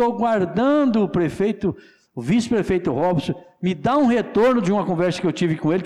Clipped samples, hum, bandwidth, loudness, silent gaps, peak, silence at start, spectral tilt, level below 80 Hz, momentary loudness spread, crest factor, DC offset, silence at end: under 0.1%; none; 11.5 kHz; -20 LUFS; none; -12 dBFS; 0 s; -7 dB/octave; -50 dBFS; 8 LU; 8 dB; under 0.1%; 0 s